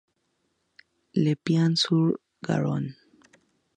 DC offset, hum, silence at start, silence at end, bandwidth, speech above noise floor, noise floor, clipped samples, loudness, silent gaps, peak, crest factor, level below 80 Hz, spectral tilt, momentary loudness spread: under 0.1%; none; 1.15 s; 0.85 s; 9.8 kHz; 50 dB; -74 dBFS; under 0.1%; -25 LUFS; none; -10 dBFS; 18 dB; -70 dBFS; -6.5 dB/octave; 10 LU